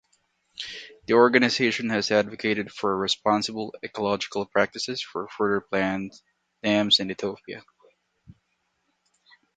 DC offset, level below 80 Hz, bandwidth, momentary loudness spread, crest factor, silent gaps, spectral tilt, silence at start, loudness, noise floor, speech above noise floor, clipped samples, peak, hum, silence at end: under 0.1%; -64 dBFS; 9.4 kHz; 17 LU; 24 dB; none; -4 dB/octave; 0.6 s; -24 LUFS; -74 dBFS; 49 dB; under 0.1%; -2 dBFS; none; 1.95 s